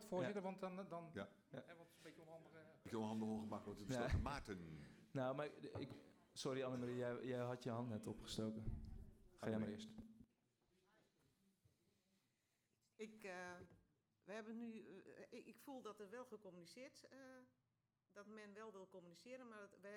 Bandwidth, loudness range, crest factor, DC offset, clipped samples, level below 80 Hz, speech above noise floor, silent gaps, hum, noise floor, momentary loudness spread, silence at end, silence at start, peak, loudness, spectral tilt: 16 kHz; 13 LU; 20 dB; under 0.1%; under 0.1%; -64 dBFS; 39 dB; none; none; -89 dBFS; 16 LU; 0 s; 0 s; -32 dBFS; -51 LUFS; -6 dB/octave